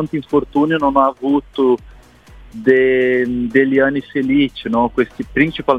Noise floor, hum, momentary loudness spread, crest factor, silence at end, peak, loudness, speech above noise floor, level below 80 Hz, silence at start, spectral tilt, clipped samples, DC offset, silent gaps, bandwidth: -42 dBFS; none; 6 LU; 16 dB; 0 s; 0 dBFS; -16 LUFS; 26 dB; -42 dBFS; 0 s; -7.5 dB/octave; under 0.1%; under 0.1%; none; 6.6 kHz